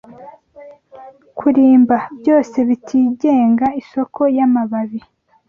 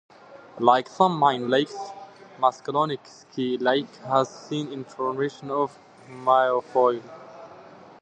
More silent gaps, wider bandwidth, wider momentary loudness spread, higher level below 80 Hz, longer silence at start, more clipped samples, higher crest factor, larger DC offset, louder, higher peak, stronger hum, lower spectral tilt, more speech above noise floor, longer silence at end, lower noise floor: neither; second, 6.8 kHz vs 9.2 kHz; second, 12 LU vs 19 LU; first, -58 dBFS vs -76 dBFS; about the same, 0.2 s vs 0.3 s; neither; second, 14 dB vs 22 dB; neither; first, -15 LUFS vs -24 LUFS; about the same, -2 dBFS vs -2 dBFS; neither; first, -8 dB/octave vs -5.5 dB/octave; first, 27 dB vs 23 dB; about the same, 0.5 s vs 0.4 s; second, -41 dBFS vs -47 dBFS